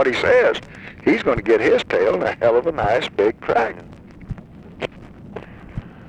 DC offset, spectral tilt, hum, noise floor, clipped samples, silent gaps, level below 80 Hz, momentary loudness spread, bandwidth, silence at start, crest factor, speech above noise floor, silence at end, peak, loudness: under 0.1%; -6 dB/octave; none; -39 dBFS; under 0.1%; none; -44 dBFS; 21 LU; 9.4 kHz; 0 s; 16 dB; 22 dB; 0 s; -4 dBFS; -18 LUFS